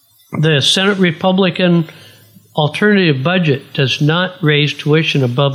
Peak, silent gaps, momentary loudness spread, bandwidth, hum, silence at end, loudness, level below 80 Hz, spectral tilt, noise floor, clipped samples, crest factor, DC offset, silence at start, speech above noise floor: 0 dBFS; none; 6 LU; 14.5 kHz; none; 0 s; -13 LUFS; -62 dBFS; -5.5 dB/octave; -43 dBFS; under 0.1%; 14 dB; under 0.1%; 0.3 s; 30 dB